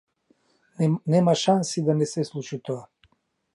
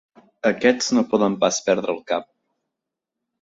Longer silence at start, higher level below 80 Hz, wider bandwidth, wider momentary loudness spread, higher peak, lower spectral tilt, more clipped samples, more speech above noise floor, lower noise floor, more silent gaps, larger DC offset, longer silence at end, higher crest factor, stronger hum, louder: first, 0.8 s vs 0.45 s; second, -70 dBFS vs -64 dBFS; first, 11.5 kHz vs 8 kHz; first, 13 LU vs 7 LU; second, -8 dBFS vs -2 dBFS; first, -6 dB/octave vs -4 dB/octave; neither; second, 44 dB vs 64 dB; second, -67 dBFS vs -84 dBFS; neither; neither; second, 0.7 s vs 1.2 s; about the same, 18 dB vs 20 dB; neither; second, -24 LUFS vs -21 LUFS